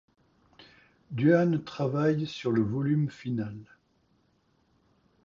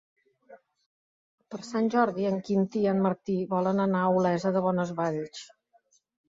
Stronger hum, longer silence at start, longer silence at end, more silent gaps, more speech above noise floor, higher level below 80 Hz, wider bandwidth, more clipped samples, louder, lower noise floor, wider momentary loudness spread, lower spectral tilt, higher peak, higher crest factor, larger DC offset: neither; about the same, 0.6 s vs 0.5 s; first, 1.6 s vs 0.85 s; second, none vs 0.86-1.38 s; about the same, 42 dB vs 40 dB; first, -64 dBFS vs -70 dBFS; about the same, 7.2 kHz vs 7.8 kHz; neither; about the same, -28 LUFS vs -27 LUFS; about the same, -69 dBFS vs -67 dBFS; about the same, 12 LU vs 10 LU; about the same, -8.5 dB/octave vs -7.5 dB/octave; about the same, -10 dBFS vs -12 dBFS; about the same, 20 dB vs 18 dB; neither